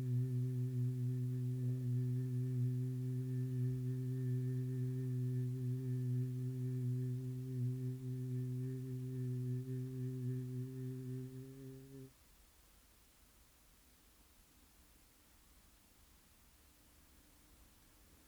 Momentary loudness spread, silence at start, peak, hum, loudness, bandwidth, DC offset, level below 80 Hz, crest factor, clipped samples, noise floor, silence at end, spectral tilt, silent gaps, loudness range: 7 LU; 0 s; -30 dBFS; none; -41 LUFS; 20 kHz; under 0.1%; -70 dBFS; 12 dB; under 0.1%; -67 dBFS; 0.1 s; -9 dB/octave; none; 12 LU